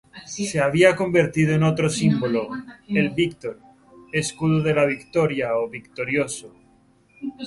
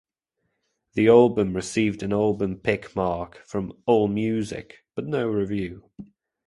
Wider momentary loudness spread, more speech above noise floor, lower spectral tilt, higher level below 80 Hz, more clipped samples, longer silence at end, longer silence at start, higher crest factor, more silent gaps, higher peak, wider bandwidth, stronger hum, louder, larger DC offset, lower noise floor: about the same, 16 LU vs 16 LU; second, 36 dB vs 55 dB; about the same, -5.5 dB/octave vs -6.5 dB/octave; about the same, -54 dBFS vs -52 dBFS; neither; second, 0 s vs 0.45 s; second, 0.15 s vs 0.95 s; about the same, 20 dB vs 22 dB; neither; about the same, -2 dBFS vs -2 dBFS; about the same, 11.5 kHz vs 11.5 kHz; neither; about the same, -21 LUFS vs -23 LUFS; neither; second, -57 dBFS vs -78 dBFS